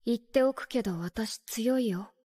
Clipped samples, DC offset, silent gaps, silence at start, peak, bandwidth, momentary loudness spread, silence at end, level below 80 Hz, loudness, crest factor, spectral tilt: under 0.1%; under 0.1%; none; 0.05 s; -12 dBFS; 16 kHz; 7 LU; 0.2 s; -60 dBFS; -30 LUFS; 18 dB; -5 dB/octave